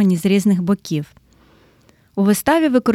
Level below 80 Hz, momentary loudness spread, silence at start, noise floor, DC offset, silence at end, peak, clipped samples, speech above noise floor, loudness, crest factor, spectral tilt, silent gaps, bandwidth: -54 dBFS; 11 LU; 0 s; -53 dBFS; under 0.1%; 0 s; -2 dBFS; under 0.1%; 38 dB; -17 LUFS; 16 dB; -6 dB/octave; none; 15.5 kHz